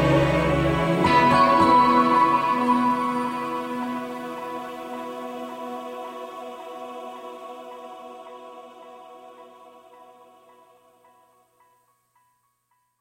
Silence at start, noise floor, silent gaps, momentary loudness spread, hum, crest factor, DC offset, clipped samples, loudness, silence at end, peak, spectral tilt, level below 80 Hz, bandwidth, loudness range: 0 s; -71 dBFS; none; 24 LU; 60 Hz at -70 dBFS; 18 dB; under 0.1%; under 0.1%; -21 LUFS; 3.3 s; -6 dBFS; -6.5 dB/octave; -46 dBFS; 16.5 kHz; 23 LU